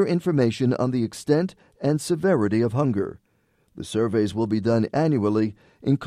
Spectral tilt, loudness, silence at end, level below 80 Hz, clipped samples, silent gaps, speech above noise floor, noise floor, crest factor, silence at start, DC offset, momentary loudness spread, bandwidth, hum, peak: -7 dB/octave; -23 LUFS; 0 s; -58 dBFS; under 0.1%; none; 43 dB; -66 dBFS; 16 dB; 0 s; under 0.1%; 8 LU; 13.5 kHz; none; -6 dBFS